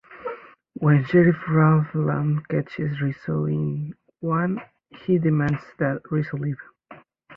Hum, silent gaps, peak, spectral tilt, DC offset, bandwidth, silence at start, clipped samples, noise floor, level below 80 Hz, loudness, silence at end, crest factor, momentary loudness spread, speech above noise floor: none; none; -4 dBFS; -10.5 dB/octave; under 0.1%; 5.2 kHz; 0.1 s; under 0.1%; -49 dBFS; -58 dBFS; -23 LUFS; 0 s; 18 dB; 17 LU; 27 dB